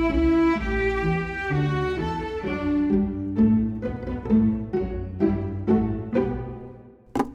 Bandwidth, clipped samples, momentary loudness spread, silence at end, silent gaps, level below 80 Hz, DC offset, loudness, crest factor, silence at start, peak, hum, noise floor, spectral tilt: 8 kHz; under 0.1%; 10 LU; 0 s; none; -36 dBFS; under 0.1%; -24 LUFS; 16 dB; 0 s; -8 dBFS; none; -45 dBFS; -8.5 dB/octave